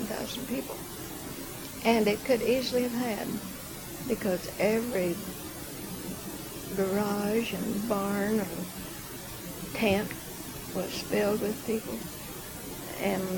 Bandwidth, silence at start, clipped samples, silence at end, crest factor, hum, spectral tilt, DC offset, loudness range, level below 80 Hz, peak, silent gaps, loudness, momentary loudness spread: 19 kHz; 0 s; under 0.1%; 0 s; 22 dB; none; -4.5 dB/octave; under 0.1%; 3 LU; -54 dBFS; -10 dBFS; none; -31 LUFS; 12 LU